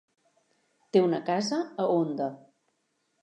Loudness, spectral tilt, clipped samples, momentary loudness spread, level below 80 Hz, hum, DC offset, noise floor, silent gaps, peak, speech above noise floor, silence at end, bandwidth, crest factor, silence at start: -28 LUFS; -6 dB/octave; under 0.1%; 7 LU; -86 dBFS; none; under 0.1%; -76 dBFS; none; -10 dBFS; 49 dB; 0.85 s; 10 kHz; 20 dB; 0.95 s